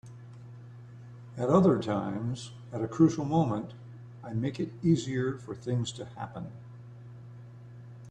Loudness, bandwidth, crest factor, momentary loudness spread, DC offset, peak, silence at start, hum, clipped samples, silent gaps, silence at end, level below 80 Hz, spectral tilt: -30 LUFS; 9.4 kHz; 20 dB; 23 LU; under 0.1%; -10 dBFS; 0.05 s; none; under 0.1%; none; 0 s; -62 dBFS; -7.5 dB/octave